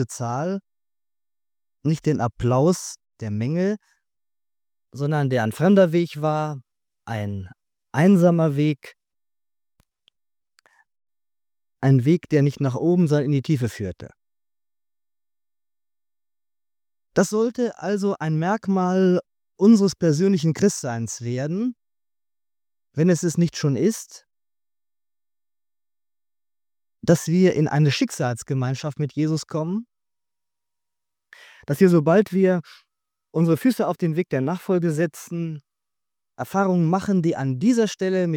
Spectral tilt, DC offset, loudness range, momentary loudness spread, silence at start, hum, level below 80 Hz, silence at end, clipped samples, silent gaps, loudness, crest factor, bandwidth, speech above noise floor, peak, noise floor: -7 dB/octave; under 0.1%; 8 LU; 13 LU; 0 s; none; -60 dBFS; 0 s; under 0.1%; none; -21 LUFS; 20 dB; 17 kHz; over 70 dB; -4 dBFS; under -90 dBFS